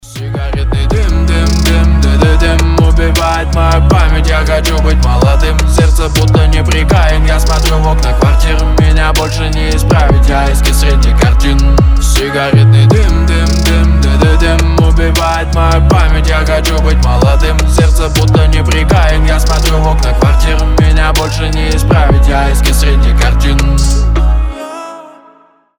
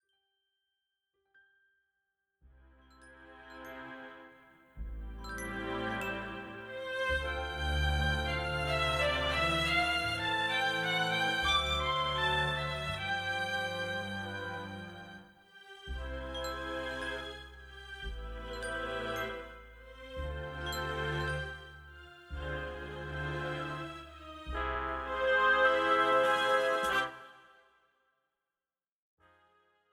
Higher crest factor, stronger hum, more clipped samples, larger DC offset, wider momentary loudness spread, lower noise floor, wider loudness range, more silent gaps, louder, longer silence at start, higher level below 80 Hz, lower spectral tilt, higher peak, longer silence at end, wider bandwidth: second, 8 dB vs 20 dB; neither; neither; neither; second, 4 LU vs 20 LU; second, -45 dBFS vs under -90 dBFS; second, 2 LU vs 12 LU; neither; first, -10 LUFS vs -33 LUFS; second, 0.05 s vs 2.45 s; first, -10 dBFS vs -46 dBFS; first, -5.5 dB/octave vs -4 dB/octave; first, 0 dBFS vs -16 dBFS; second, 0.7 s vs 2.5 s; about the same, 17 kHz vs 16 kHz